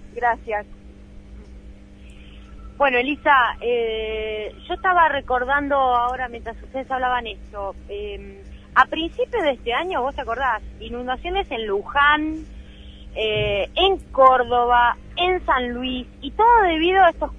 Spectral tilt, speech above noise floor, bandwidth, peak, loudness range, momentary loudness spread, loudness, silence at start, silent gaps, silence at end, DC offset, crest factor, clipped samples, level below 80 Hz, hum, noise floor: -5.5 dB/octave; 22 dB; 9.8 kHz; 0 dBFS; 6 LU; 16 LU; -20 LUFS; 0 s; none; 0 s; under 0.1%; 20 dB; under 0.1%; -40 dBFS; none; -42 dBFS